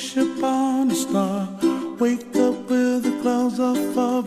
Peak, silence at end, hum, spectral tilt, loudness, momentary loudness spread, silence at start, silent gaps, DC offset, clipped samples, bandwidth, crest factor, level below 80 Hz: -8 dBFS; 0 s; none; -5 dB/octave; -22 LUFS; 3 LU; 0 s; none; under 0.1%; under 0.1%; 15.5 kHz; 14 dB; -64 dBFS